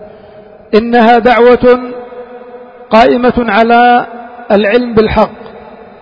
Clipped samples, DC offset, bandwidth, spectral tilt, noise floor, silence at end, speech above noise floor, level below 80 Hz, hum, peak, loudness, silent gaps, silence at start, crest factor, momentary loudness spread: 0.6%; under 0.1%; 7.4 kHz; -7 dB/octave; -35 dBFS; 0.25 s; 28 dB; -34 dBFS; none; 0 dBFS; -8 LUFS; none; 0 s; 10 dB; 19 LU